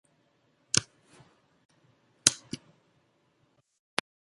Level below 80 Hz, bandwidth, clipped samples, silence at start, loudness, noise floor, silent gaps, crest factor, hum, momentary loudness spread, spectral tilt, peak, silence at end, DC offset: -66 dBFS; 11.5 kHz; under 0.1%; 0.75 s; -28 LUFS; -71 dBFS; 1.65-1.69 s; 36 dB; none; 18 LU; -1 dB/octave; 0 dBFS; 1.7 s; under 0.1%